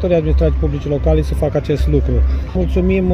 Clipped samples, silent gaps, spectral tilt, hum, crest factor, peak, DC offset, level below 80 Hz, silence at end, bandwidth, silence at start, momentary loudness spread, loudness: under 0.1%; none; -9 dB/octave; none; 12 dB; -2 dBFS; under 0.1%; -18 dBFS; 0 s; 6.4 kHz; 0 s; 3 LU; -16 LUFS